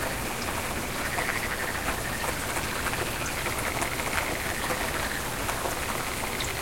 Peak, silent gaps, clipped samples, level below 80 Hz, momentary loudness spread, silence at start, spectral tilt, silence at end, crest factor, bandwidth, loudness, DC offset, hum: -8 dBFS; none; under 0.1%; -42 dBFS; 2 LU; 0 s; -3 dB/octave; 0 s; 22 dB; 16.5 kHz; -29 LUFS; under 0.1%; none